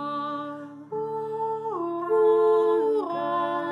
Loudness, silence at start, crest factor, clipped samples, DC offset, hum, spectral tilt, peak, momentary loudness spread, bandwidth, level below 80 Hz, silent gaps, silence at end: -25 LUFS; 0 s; 14 dB; under 0.1%; under 0.1%; none; -7 dB/octave; -12 dBFS; 13 LU; 5.4 kHz; -88 dBFS; none; 0 s